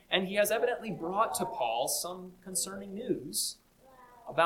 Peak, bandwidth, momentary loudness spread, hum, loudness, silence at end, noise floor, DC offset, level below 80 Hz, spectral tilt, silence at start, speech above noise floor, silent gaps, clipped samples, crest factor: -12 dBFS; 18 kHz; 11 LU; none; -32 LUFS; 0 s; -58 dBFS; under 0.1%; -66 dBFS; -2.5 dB/octave; 0.1 s; 25 dB; none; under 0.1%; 22 dB